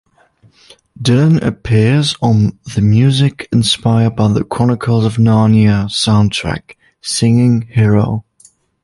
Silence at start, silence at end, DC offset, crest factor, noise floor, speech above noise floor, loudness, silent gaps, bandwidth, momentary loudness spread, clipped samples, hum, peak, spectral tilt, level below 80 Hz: 1 s; 0.65 s; under 0.1%; 12 dB; -50 dBFS; 39 dB; -13 LUFS; none; 11.5 kHz; 8 LU; under 0.1%; none; 0 dBFS; -6 dB/octave; -38 dBFS